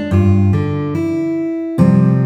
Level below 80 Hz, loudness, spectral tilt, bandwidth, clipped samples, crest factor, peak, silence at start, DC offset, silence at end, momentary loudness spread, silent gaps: -40 dBFS; -15 LUFS; -9.5 dB/octave; 8.8 kHz; under 0.1%; 14 dB; 0 dBFS; 0 s; under 0.1%; 0 s; 7 LU; none